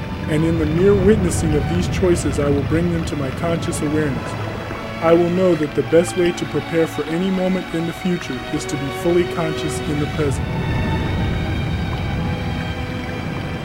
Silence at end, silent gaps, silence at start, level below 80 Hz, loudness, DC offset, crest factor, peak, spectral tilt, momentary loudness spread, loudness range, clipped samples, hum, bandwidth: 0 s; none; 0 s; -32 dBFS; -20 LUFS; under 0.1%; 18 dB; -2 dBFS; -6.5 dB/octave; 9 LU; 4 LU; under 0.1%; none; 16.5 kHz